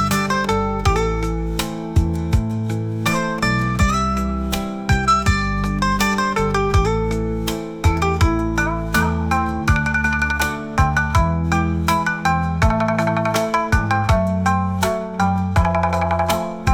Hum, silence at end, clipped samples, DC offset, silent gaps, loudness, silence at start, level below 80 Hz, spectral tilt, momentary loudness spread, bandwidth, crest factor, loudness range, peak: none; 0 s; under 0.1%; 0.1%; none; -19 LUFS; 0 s; -28 dBFS; -5.5 dB/octave; 4 LU; 19 kHz; 14 dB; 2 LU; -4 dBFS